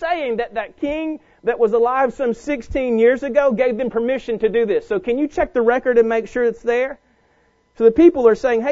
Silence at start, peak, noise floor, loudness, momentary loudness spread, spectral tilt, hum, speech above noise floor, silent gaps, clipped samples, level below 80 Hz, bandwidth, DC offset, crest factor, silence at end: 0 s; -2 dBFS; -59 dBFS; -18 LUFS; 9 LU; -6.5 dB/octave; none; 42 dB; none; under 0.1%; -44 dBFS; 7.6 kHz; under 0.1%; 16 dB; 0 s